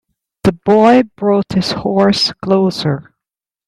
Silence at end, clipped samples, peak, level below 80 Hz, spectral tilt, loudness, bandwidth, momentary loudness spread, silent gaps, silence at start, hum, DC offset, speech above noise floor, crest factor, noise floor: 0.65 s; under 0.1%; 0 dBFS; -46 dBFS; -6 dB/octave; -13 LUFS; 12.5 kHz; 8 LU; none; 0.45 s; none; under 0.1%; 72 dB; 14 dB; -85 dBFS